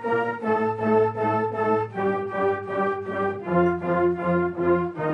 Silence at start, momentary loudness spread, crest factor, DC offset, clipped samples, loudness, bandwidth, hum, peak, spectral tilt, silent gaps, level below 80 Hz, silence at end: 0 s; 4 LU; 14 dB; under 0.1%; under 0.1%; -24 LUFS; 5.6 kHz; none; -8 dBFS; -9 dB/octave; none; -60 dBFS; 0 s